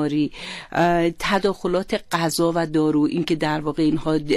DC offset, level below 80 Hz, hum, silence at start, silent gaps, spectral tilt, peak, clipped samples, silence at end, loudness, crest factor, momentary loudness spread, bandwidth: under 0.1%; -44 dBFS; none; 0 s; none; -5.5 dB/octave; -10 dBFS; under 0.1%; 0 s; -21 LUFS; 12 dB; 5 LU; 13.5 kHz